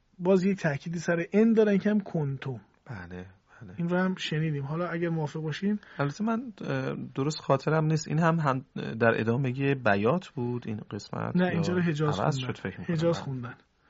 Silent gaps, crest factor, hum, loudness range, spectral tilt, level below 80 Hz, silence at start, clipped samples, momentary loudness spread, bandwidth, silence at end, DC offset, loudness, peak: none; 20 dB; none; 4 LU; -6 dB/octave; -64 dBFS; 0.2 s; under 0.1%; 12 LU; 7.6 kHz; 0.35 s; under 0.1%; -28 LUFS; -8 dBFS